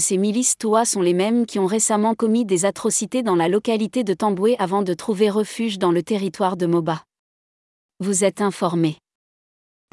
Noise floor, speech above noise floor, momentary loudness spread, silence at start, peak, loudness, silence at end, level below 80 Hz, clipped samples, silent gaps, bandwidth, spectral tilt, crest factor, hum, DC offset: under -90 dBFS; over 70 dB; 4 LU; 0 s; -6 dBFS; -20 LUFS; 1 s; -68 dBFS; under 0.1%; 7.19-7.89 s; 12 kHz; -4.5 dB/octave; 14 dB; none; under 0.1%